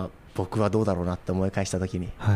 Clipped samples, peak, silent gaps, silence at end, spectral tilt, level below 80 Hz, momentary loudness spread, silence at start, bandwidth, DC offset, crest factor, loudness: under 0.1%; -10 dBFS; none; 0 s; -7 dB/octave; -46 dBFS; 7 LU; 0 s; 14 kHz; under 0.1%; 16 dB; -28 LUFS